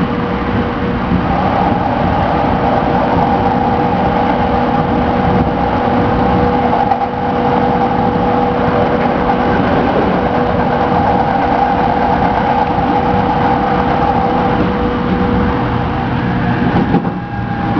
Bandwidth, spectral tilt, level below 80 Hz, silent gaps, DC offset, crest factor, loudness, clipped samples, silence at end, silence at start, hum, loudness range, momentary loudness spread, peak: 5.4 kHz; -8.5 dB/octave; -28 dBFS; none; under 0.1%; 12 dB; -13 LUFS; under 0.1%; 0 s; 0 s; none; 1 LU; 3 LU; 0 dBFS